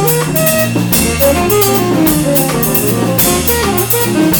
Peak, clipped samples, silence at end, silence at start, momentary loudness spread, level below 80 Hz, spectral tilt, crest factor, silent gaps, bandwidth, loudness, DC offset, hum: 0 dBFS; under 0.1%; 0 s; 0 s; 2 LU; -30 dBFS; -4.5 dB/octave; 10 dB; none; over 20 kHz; -11 LUFS; under 0.1%; none